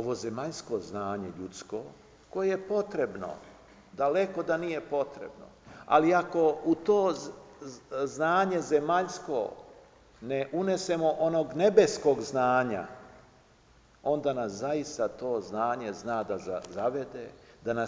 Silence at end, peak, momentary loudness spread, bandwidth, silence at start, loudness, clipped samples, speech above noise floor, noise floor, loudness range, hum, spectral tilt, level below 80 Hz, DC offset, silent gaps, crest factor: 0 s; -8 dBFS; 17 LU; 8 kHz; 0 s; -29 LUFS; under 0.1%; 31 dB; -60 dBFS; 6 LU; none; -5.5 dB/octave; -64 dBFS; under 0.1%; none; 22 dB